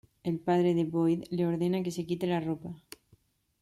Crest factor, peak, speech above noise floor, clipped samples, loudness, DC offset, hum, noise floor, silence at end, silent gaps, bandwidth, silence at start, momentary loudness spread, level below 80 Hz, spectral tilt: 14 dB; -18 dBFS; 37 dB; under 0.1%; -30 LUFS; under 0.1%; none; -66 dBFS; 0.85 s; none; 13.5 kHz; 0.25 s; 10 LU; -66 dBFS; -7.5 dB/octave